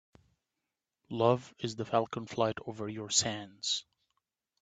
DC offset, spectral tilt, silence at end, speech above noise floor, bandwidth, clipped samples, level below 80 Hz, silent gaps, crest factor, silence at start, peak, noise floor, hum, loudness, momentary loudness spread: under 0.1%; -3.5 dB/octave; 0.8 s; 55 dB; 9.4 kHz; under 0.1%; -72 dBFS; none; 24 dB; 1.1 s; -12 dBFS; -88 dBFS; none; -33 LUFS; 11 LU